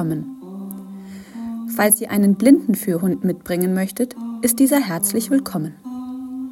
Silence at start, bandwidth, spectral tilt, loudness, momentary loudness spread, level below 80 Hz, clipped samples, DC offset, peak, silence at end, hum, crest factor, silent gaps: 0 s; 17 kHz; -5 dB/octave; -19 LUFS; 18 LU; -60 dBFS; under 0.1%; under 0.1%; 0 dBFS; 0 s; none; 18 dB; none